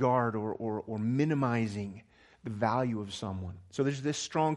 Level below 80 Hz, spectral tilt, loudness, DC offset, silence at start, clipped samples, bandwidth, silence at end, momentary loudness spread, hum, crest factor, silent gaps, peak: -68 dBFS; -6 dB/octave; -32 LUFS; under 0.1%; 0 s; under 0.1%; 11.5 kHz; 0 s; 12 LU; none; 18 dB; none; -14 dBFS